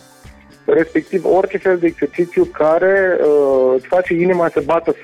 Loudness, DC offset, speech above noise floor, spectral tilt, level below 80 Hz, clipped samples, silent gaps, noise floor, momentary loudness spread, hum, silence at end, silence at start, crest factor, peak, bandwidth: -15 LUFS; under 0.1%; 27 dB; -7.5 dB/octave; -48 dBFS; under 0.1%; none; -42 dBFS; 5 LU; none; 0 s; 0.7 s; 10 dB; -6 dBFS; 10.5 kHz